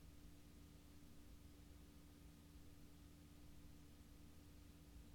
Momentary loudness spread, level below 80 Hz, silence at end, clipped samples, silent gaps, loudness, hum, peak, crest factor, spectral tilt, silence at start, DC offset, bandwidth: 1 LU; -66 dBFS; 0 s; under 0.1%; none; -65 LUFS; none; -50 dBFS; 12 dB; -5 dB/octave; 0 s; under 0.1%; 19 kHz